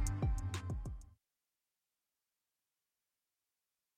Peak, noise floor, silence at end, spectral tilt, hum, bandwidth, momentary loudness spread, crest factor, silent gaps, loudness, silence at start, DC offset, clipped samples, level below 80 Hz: -24 dBFS; under -90 dBFS; 2.85 s; -5.5 dB/octave; none; 15 kHz; 12 LU; 20 dB; none; -42 LUFS; 0 s; under 0.1%; under 0.1%; -46 dBFS